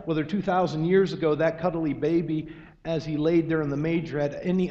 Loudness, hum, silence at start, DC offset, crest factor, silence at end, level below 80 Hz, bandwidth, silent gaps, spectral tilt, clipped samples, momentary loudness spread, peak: -26 LUFS; none; 0 s; under 0.1%; 16 dB; 0 s; -52 dBFS; 7.6 kHz; none; -8 dB/octave; under 0.1%; 8 LU; -10 dBFS